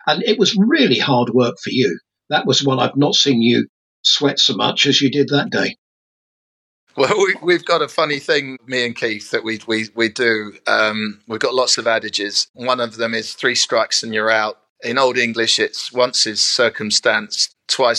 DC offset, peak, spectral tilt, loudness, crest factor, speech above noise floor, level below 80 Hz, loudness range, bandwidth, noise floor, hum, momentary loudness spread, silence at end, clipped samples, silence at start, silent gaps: under 0.1%; 0 dBFS; -3 dB/octave; -16 LUFS; 16 dB; over 73 dB; -76 dBFS; 4 LU; 12.5 kHz; under -90 dBFS; none; 8 LU; 0 s; under 0.1%; 0.05 s; 3.69-4.03 s, 5.78-6.87 s, 12.49-12.54 s, 14.69-14.76 s